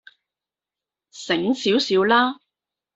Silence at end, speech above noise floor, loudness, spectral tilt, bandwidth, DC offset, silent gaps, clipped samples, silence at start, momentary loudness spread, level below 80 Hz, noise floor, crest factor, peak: 0.6 s; 70 dB; -20 LUFS; -4 dB/octave; 8 kHz; under 0.1%; none; under 0.1%; 1.15 s; 15 LU; -66 dBFS; -89 dBFS; 20 dB; -4 dBFS